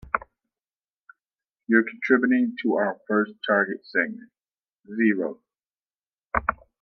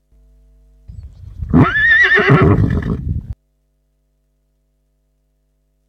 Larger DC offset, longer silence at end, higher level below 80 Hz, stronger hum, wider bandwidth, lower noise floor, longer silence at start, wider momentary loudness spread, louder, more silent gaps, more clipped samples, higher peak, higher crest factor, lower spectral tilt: neither; second, 0.25 s vs 2.55 s; second, -54 dBFS vs -30 dBFS; second, none vs 50 Hz at -40 dBFS; about the same, 6 kHz vs 6.4 kHz; first, under -90 dBFS vs -63 dBFS; second, 0.05 s vs 0.9 s; second, 9 LU vs 24 LU; second, -24 LUFS vs -12 LUFS; first, 0.90-1.06 s, 4.79-4.83 s, 6.07-6.11 s vs none; neither; second, -4 dBFS vs 0 dBFS; first, 22 dB vs 16 dB; about the same, -8 dB/octave vs -7.5 dB/octave